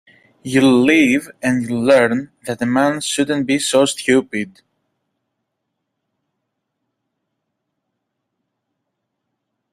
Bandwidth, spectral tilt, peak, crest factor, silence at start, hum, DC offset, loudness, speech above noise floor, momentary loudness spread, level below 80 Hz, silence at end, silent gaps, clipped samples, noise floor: 14.5 kHz; -4.5 dB/octave; -2 dBFS; 18 dB; 0.45 s; none; under 0.1%; -16 LUFS; 60 dB; 13 LU; -58 dBFS; 5.25 s; none; under 0.1%; -76 dBFS